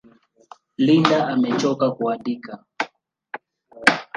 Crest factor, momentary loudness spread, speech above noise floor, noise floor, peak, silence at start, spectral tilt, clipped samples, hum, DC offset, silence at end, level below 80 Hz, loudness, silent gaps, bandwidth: 22 dB; 21 LU; 31 dB; -51 dBFS; 0 dBFS; 0.8 s; -5.5 dB/octave; under 0.1%; none; under 0.1%; 0.15 s; -68 dBFS; -21 LUFS; none; 11.5 kHz